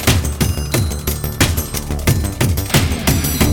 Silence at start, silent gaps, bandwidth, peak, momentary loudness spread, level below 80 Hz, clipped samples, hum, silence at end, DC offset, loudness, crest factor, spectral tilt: 0 s; none; 19.5 kHz; 0 dBFS; 6 LU; -24 dBFS; under 0.1%; none; 0 s; under 0.1%; -17 LUFS; 16 dB; -4.5 dB/octave